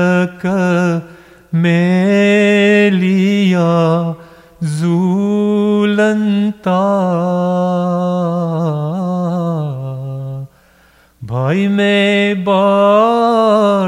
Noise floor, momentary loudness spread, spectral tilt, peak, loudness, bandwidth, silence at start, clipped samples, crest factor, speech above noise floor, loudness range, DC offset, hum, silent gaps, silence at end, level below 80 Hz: -49 dBFS; 11 LU; -7 dB/octave; 0 dBFS; -14 LUFS; 11 kHz; 0 s; under 0.1%; 12 dB; 37 dB; 6 LU; under 0.1%; none; none; 0 s; -54 dBFS